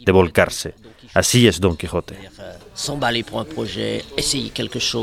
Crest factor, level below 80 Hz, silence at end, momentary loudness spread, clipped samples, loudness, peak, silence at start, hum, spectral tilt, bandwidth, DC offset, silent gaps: 20 dB; -42 dBFS; 0 s; 19 LU; under 0.1%; -19 LUFS; 0 dBFS; 0 s; none; -4 dB/octave; 16.5 kHz; under 0.1%; none